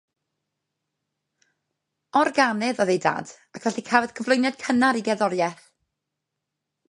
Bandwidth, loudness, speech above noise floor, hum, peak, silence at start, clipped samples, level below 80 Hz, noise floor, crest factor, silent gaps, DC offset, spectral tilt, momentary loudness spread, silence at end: 11 kHz; -23 LUFS; 60 dB; none; -2 dBFS; 2.15 s; under 0.1%; -72 dBFS; -83 dBFS; 24 dB; none; under 0.1%; -4.5 dB/octave; 8 LU; 1.35 s